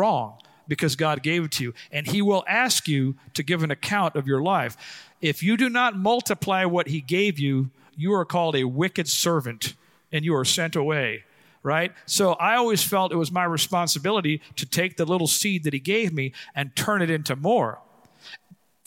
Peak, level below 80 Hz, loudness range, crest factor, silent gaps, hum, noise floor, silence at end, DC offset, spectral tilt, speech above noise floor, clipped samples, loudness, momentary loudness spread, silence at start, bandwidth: -6 dBFS; -68 dBFS; 2 LU; 18 dB; none; none; -56 dBFS; 0.5 s; under 0.1%; -4 dB/octave; 32 dB; under 0.1%; -23 LUFS; 9 LU; 0 s; 17 kHz